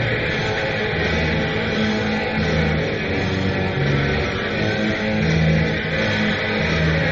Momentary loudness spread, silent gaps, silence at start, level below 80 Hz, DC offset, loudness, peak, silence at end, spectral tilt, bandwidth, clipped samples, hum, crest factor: 3 LU; none; 0 s; -34 dBFS; under 0.1%; -20 LUFS; -6 dBFS; 0 s; -4.5 dB/octave; 7.6 kHz; under 0.1%; none; 14 dB